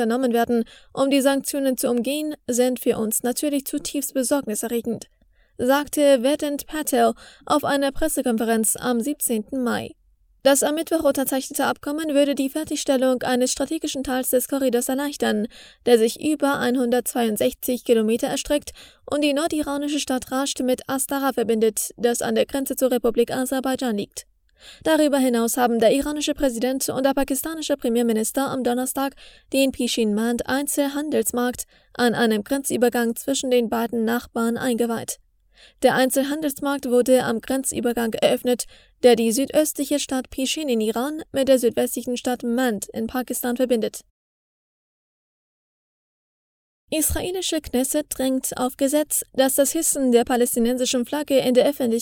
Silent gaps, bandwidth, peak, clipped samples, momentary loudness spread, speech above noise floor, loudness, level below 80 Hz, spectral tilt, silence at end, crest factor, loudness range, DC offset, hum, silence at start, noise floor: 44.10-46.88 s; over 20 kHz; -2 dBFS; under 0.1%; 7 LU; over 68 dB; -22 LUFS; -50 dBFS; -3 dB/octave; 0 s; 20 dB; 3 LU; under 0.1%; none; 0 s; under -90 dBFS